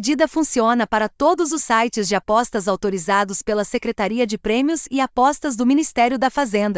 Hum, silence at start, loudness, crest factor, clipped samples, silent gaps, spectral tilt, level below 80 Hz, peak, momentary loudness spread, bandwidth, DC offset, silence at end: none; 0 s; -19 LUFS; 16 dB; under 0.1%; none; -4 dB/octave; -50 dBFS; -4 dBFS; 4 LU; 8 kHz; under 0.1%; 0 s